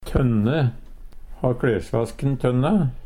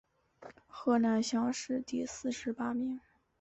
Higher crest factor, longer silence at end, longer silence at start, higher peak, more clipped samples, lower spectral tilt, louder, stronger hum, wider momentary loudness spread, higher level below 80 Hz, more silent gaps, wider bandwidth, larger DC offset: about the same, 16 dB vs 16 dB; second, 0 s vs 0.45 s; second, 0 s vs 0.4 s; first, -6 dBFS vs -18 dBFS; neither; first, -8.5 dB/octave vs -4.5 dB/octave; first, -22 LUFS vs -34 LUFS; neither; second, 6 LU vs 10 LU; first, -36 dBFS vs -70 dBFS; neither; first, 11.5 kHz vs 8.2 kHz; neither